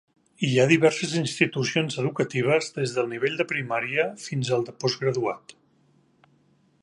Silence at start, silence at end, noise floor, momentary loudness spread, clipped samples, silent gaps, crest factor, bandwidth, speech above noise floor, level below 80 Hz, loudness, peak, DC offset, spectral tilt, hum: 0.4 s; 1.3 s; -63 dBFS; 8 LU; under 0.1%; none; 22 dB; 11.5 kHz; 38 dB; -70 dBFS; -25 LUFS; -4 dBFS; under 0.1%; -5 dB/octave; none